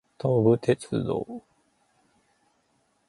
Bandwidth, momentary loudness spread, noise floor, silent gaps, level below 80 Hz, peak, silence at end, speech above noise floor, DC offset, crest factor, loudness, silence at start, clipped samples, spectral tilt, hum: 11.5 kHz; 16 LU; -70 dBFS; none; -60 dBFS; -8 dBFS; 1.7 s; 45 dB; under 0.1%; 20 dB; -25 LUFS; 0.25 s; under 0.1%; -8 dB/octave; none